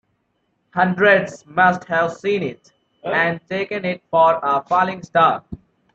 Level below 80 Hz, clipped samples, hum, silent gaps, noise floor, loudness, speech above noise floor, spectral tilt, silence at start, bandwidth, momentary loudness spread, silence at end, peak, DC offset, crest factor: -58 dBFS; under 0.1%; none; none; -69 dBFS; -18 LUFS; 50 dB; -6 dB/octave; 0.75 s; 8 kHz; 13 LU; 0.4 s; -2 dBFS; under 0.1%; 18 dB